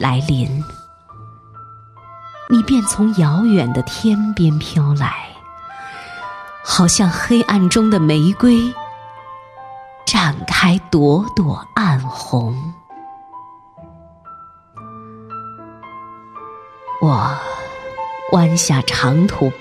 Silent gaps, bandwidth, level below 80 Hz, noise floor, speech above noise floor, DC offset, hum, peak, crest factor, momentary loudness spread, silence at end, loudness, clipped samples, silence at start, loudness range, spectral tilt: none; 14 kHz; -44 dBFS; -41 dBFS; 26 dB; under 0.1%; none; 0 dBFS; 18 dB; 22 LU; 0 s; -15 LUFS; under 0.1%; 0 s; 14 LU; -5 dB/octave